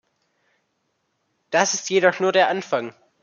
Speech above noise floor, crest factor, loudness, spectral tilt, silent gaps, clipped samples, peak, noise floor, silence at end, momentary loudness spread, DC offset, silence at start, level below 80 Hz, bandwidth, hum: 52 dB; 22 dB; -20 LUFS; -2.5 dB/octave; none; under 0.1%; -2 dBFS; -72 dBFS; 0.35 s; 8 LU; under 0.1%; 1.5 s; -78 dBFS; 7.4 kHz; none